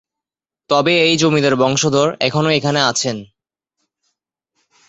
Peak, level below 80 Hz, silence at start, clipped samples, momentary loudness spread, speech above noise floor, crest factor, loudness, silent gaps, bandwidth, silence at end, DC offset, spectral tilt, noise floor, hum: -2 dBFS; -56 dBFS; 0.7 s; under 0.1%; 6 LU; 72 dB; 16 dB; -15 LUFS; none; 8.4 kHz; 1.65 s; under 0.1%; -4 dB/octave; -87 dBFS; none